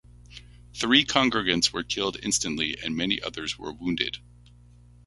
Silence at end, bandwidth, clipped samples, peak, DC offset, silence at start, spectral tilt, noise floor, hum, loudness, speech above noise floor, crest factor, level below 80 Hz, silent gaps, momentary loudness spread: 0.9 s; 11.5 kHz; under 0.1%; -4 dBFS; under 0.1%; 0.3 s; -2.5 dB/octave; -52 dBFS; 60 Hz at -50 dBFS; -25 LUFS; 26 dB; 24 dB; -52 dBFS; none; 12 LU